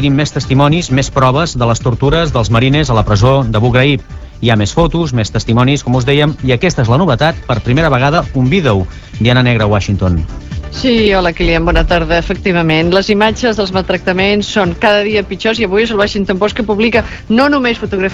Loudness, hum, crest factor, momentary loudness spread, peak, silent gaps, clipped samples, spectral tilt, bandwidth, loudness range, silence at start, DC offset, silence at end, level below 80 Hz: -12 LUFS; none; 12 dB; 5 LU; 0 dBFS; none; under 0.1%; -6 dB/octave; 8 kHz; 1 LU; 0 s; 0.3%; 0 s; -26 dBFS